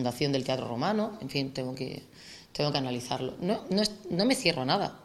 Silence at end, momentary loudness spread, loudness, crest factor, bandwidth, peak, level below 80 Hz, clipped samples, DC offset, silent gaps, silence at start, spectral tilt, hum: 0 s; 12 LU; -30 LUFS; 22 dB; 15 kHz; -8 dBFS; -60 dBFS; under 0.1%; under 0.1%; none; 0 s; -5 dB/octave; none